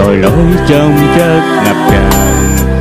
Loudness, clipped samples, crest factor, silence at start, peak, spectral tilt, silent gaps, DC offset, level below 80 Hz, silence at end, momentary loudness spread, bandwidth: -8 LUFS; 0.8%; 8 dB; 0 s; 0 dBFS; -5.5 dB/octave; none; under 0.1%; -16 dBFS; 0 s; 2 LU; 16 kHz